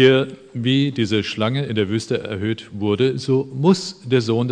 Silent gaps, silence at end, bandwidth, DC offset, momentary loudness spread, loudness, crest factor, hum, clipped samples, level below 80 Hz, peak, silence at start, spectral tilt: none; 0 s; 10 kHz; under 0.1%; 7 LU; -20 LUFS; 18 dB; none; under 0.1%; -60 dBFS; -2 dBFS; 0 s; -6 dB/octave